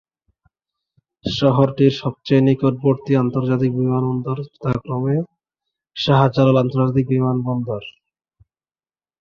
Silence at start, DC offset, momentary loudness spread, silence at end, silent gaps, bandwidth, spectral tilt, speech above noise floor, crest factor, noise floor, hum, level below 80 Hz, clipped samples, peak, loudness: 1.25 s; under 0.1%; 11 LU; 1.3 s; none; 7 kHz; -8.5 dB/octave; over 73 dB; 18 dB; under -90 dBFS; none; -52 dBFS; under 0.1%; -2 dBFS; -18 LUFS